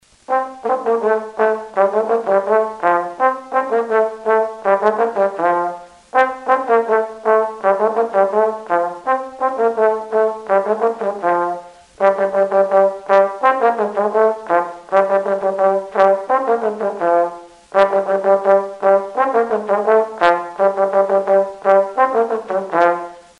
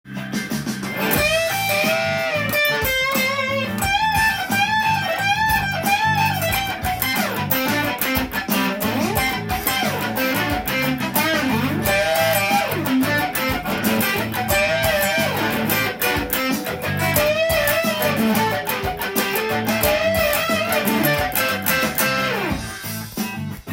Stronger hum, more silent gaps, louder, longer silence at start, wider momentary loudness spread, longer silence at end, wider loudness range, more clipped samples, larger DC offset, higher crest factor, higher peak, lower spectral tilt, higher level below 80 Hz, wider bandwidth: neither; neither; about the same, -17 LUFS vs -19 LUFS; first, 0.3 s vs 0.05 s; about the same, 5 LU vs 5 LU; first, 0.2 s vs 0 s; about the same, 2 LU vs 2 LU; neither; neither; about the same, 16 dB vs 20 dB; about the same, 0 dBFS vs -2 dBFS; first, -6 dB/octave vs -3.5 dB/octave; second, -64 dBFS vs -42 dBFS; second, 10.5 kHz vs 17 kHz